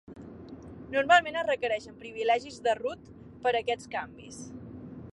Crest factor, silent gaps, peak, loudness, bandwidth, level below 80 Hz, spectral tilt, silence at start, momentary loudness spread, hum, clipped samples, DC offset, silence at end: 22 dB; none; -10 dBFS; -28 LUFS; 11.5 kHz; -60 dBFS; -3.5 dB/octave; 0.1 s; 23 LU; none; under 0.1%; under 0.1%; 0 s